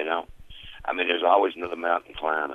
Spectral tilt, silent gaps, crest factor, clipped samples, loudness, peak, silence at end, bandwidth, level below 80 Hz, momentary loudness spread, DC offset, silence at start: -5 dB/octave; none; 20 dB; under 0.1%; -25 LUFS; -6 dBFS; 0 s; 6.4 kHz; -52 dBFS; 22 LU; under 0.1%; 0 s